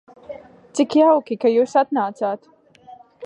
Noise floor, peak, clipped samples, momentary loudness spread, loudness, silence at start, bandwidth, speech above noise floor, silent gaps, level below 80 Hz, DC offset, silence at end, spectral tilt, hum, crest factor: -46 dBFS; -4 dBFS; under 0.1%; 23 LU; -19 LUFS; 0.3 s; 10.5 kHz; 28 dB; none; -70 dBFS; under 0.1%; 0 s; -5 dB/octave; none; 16 dB